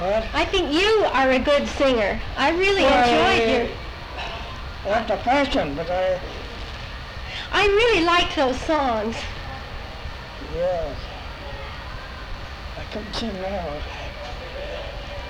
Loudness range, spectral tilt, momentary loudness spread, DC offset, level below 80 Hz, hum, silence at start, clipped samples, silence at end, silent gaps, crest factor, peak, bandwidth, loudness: 12 LU; -4.5 dB/octave; 17 LU; under 0.1%; -36 dBFS; none; 0 s; under 0.1%; 0 s; none; 14 dB; -8 dBFS; 16 kHz; -21 LUFS